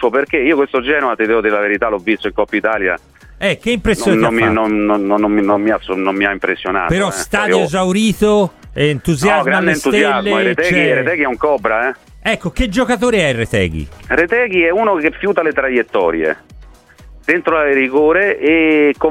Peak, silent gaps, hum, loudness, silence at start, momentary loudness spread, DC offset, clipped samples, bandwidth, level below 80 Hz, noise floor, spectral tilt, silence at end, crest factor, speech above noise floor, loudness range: 0 dBFS; none; none; -14 LUFS; 0 s; 6 LU; under 0.1%; under 0.1%; 16 kHz; -36 dBFS; -40 dBFS; -5 dB/octave; 0 s; 14 dB; 26 dB; 2 LU